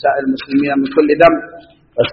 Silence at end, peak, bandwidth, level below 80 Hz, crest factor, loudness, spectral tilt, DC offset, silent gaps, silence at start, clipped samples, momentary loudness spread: 0 s; 0 dBFS; 5.8 kHz; -46 dBFS; 14 dB; -14 LUFS; -4 dB/octave; under 0.1%; none; 0.05 s; under 0.1%; 13 LU